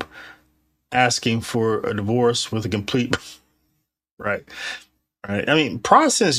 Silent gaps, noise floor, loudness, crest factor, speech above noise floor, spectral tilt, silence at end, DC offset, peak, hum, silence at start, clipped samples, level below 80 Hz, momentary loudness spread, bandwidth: 4.11-4.17 s; -72 dBFS; -21 LUFS; 22 dB; 52 dB; -4 dB/octave; 0 s; under 0.1%; 0 dBFS; none; 0 s; under 0.1%; -56 dBFS; 16 LU; 14.5 kHz